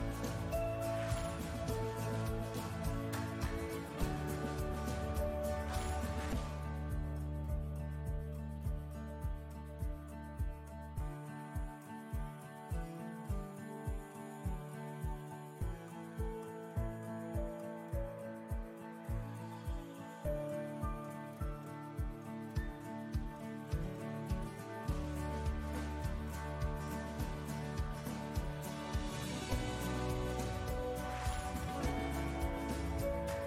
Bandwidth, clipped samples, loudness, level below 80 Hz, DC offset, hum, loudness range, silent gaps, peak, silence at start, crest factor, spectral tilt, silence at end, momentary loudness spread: 16 kHz; under 0.1%; -42 LUFS; -44 dBFS; under 0.1%; none; 6 LU; none; -24 dBFS; 0 s; 16 dB; -6 dB/octave; 0 s; 7 LU